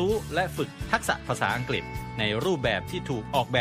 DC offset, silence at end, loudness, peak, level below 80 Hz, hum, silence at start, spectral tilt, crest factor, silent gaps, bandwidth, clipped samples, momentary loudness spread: under 0.1%; 0 s; -28 LUFS; -6 dBFS; -44 dBFS; none; 0 s; -5 dB/octave; 22 dB; none; 15.5 kHz; under 0.1%; 6 LU